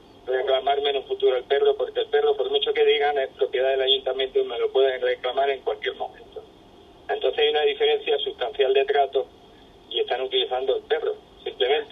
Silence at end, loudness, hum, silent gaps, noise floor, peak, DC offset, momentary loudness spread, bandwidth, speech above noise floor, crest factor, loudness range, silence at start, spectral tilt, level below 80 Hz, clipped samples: 0.05 s; -23 LUFS; none; none; -50 dBFS; -8 dBFS; under 0.1%; 10 LU; 4.7 kHz; 27 dB; 16 dB; 3 LU; 0.25 s; -4.5 dB/octave; -60 dBFS; under 0.1%